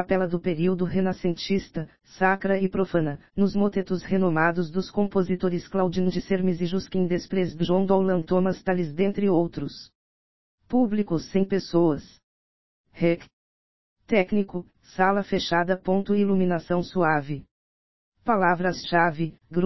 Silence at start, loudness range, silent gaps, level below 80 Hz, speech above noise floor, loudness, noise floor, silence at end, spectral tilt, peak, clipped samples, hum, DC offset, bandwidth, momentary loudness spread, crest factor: 0 s; 3 LU; 9.95-10.58 s, 12.23-12.84 s, 13.33-13.96 s, 17.51-18.12 s; -54 dBFS; over 66 dB; -25 LUFS; under -90 dBFS; 0 s; -7.5 dB/octave; -6 dBFS; under 0.1%; none; 0.9%; 6 kHz; 7 LU; 20 dB